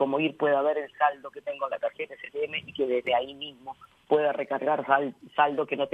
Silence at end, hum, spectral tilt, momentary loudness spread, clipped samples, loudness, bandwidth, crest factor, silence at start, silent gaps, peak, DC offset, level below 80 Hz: 0.05 s; none; -6.5 dB/octave; 12 LU; under 0.1%; -28 LUFS; 8 kHz; 20 dB; 0 s; none; -8 dBFS; under 0.1%; -74 dBFS